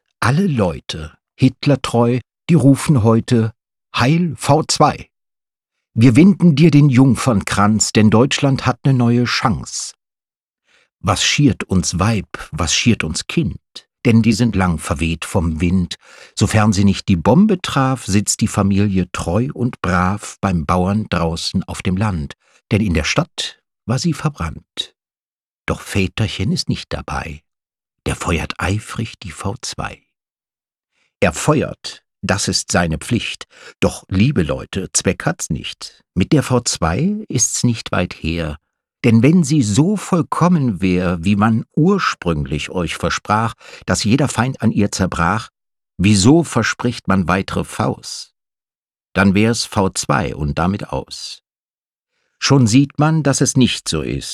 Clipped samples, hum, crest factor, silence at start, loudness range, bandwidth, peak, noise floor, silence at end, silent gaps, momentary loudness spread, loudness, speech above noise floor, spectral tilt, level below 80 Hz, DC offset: under 0.1%; none; 16 dB; 0.2 s; 8 LU; 13.5 kHz; 0 dBFS; under -90 dBFS; 0 s; 25.23-25.36 s, 25.42-25.64 s, 48.78-48.83 s, 51.59-51.64 s, 51.70-51.74 s; 13 LU; -16 LUFS; over 74 dB; -5 dB/octave; -38 dBFS; under 0.1%